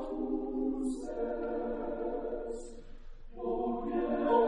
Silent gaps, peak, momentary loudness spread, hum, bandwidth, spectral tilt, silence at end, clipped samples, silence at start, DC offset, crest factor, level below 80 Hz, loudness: none; -14 dBFS; 9 LU; none; 10.5 kHz; -6.5 dB/octave; 0 s; under 0.1%; 0 s; under 0.1%; 18 dB; -48 dBFS; -36 LUFS